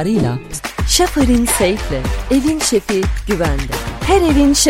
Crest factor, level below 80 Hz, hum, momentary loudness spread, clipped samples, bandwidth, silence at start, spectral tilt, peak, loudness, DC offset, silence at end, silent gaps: 14 dB; -24 dBFS; none; 8 LU; under 0.1%; 16.5 kHz; 0 s; -4 dB/octave; 0 dBFS; -15 LUFS; under 0.1%; 0 s; none